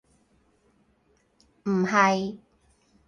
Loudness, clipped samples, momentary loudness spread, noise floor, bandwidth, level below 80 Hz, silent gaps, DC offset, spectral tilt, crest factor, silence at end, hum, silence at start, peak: -24 LUFS; under 0.1%; 15 LU; -66 dBFS; 9.8 kHz; -66 dBFS; none; under 0.1%; -5.5 dB/octave; 24 dB; 0.7 s; none; 1.65 s; -4 dBFS